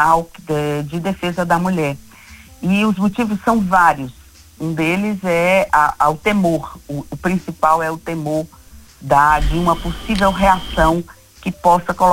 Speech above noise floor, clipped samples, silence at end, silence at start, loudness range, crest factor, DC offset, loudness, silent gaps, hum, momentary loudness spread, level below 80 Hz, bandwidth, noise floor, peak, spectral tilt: 25 dB; under 0.1%; 0 s; 0 s; 3 LU; 16 dB; under 0.1%; -17 LUFS; none; none; 12 LU; -32 dBFS; 16.5 kHz; -41 dBFS; 0 dBFS; -6 dB/octave